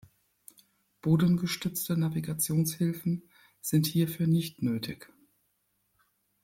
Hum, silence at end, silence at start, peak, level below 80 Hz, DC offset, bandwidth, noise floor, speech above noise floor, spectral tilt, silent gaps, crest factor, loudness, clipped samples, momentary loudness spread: none; 1.4 s; 1.05 s; -12 dBFS; -64 dBFS; under 0.1%; 16.5 kHz; -75 dBFS; 47 dB; -5.5 dB/octave; none; 18 dB; -29 LUFS; under 0.1%; 10 LU